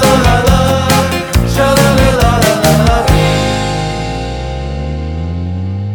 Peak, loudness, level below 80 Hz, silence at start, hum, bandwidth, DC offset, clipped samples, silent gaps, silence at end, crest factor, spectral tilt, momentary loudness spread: 0 dBFS; -12 LUFS; -20 dBFS; 0 s; none; over 20 kHz; under 0.1%; under 0.1%; none; 0 s; 10 dB; -5 dB/octave; 10 LU